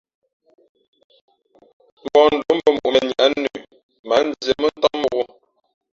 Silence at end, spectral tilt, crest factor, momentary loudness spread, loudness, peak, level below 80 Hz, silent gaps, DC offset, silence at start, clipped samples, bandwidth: 0.7 s; -4 dB/octave; 18 dB; 12 LU; -18 LUFS; -2 dBFS; -58 dBFS; 3.83-3.89 s, 3.99-4.04 s; under 0.1%; 2.05 s; under 0.1%; 7.6 kHz